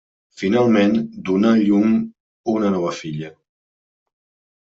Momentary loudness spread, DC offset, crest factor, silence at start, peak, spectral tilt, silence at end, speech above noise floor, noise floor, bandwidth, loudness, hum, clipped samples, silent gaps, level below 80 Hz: 14 LU; under 0.1%; 16 dB; 0.4 s; -4 dBFS; -7 dB/octave; 1.35 s; over 73 dB; under -90 dBFS; 7.6 kHz; -18 LUFS; none; under 0.1%; 2.20-2.44 s; -62 dBFS